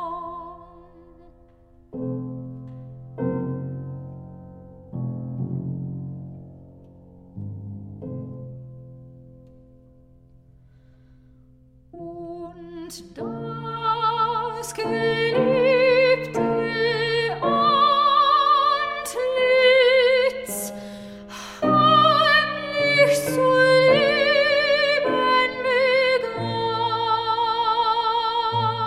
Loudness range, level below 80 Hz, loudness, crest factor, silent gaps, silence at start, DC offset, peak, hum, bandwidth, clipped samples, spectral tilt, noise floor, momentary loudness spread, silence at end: 21 LU; -56 dBFS; -20 LUFS; 18 dB; none; 0 s; under 0.1%; -6 dBFS; none; 15.5 kHz; under 0.1%; -4.5 dB/octave; -53 dBFS; 22 LU; 0 s